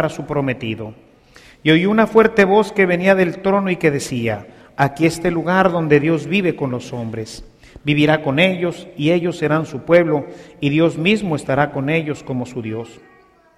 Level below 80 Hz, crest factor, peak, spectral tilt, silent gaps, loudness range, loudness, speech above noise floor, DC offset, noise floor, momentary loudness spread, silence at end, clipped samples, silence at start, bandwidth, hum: -48 dBFS; 18 dB; 0 dBFS; -6.5 dB/octave; none; 3 LU; -17 LUFS; 29 dB; under 0.1%; -46 dBFS; 13 LU; 0.65 s; under 0.1%; 0 s; 14.5 kHz; none